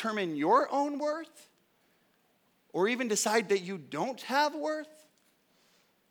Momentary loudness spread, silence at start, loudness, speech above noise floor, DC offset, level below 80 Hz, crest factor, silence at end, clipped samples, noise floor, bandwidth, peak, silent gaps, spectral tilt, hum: 13 LU; 0 s; -30 LUFS; 40 dB; under 0.1%; under -90 dBFS; 20 dB; 1.2 s; under 0.1%; -71 dBFS; over 20 kHz; -12 dBFS; none; -3.5 dB/octave; none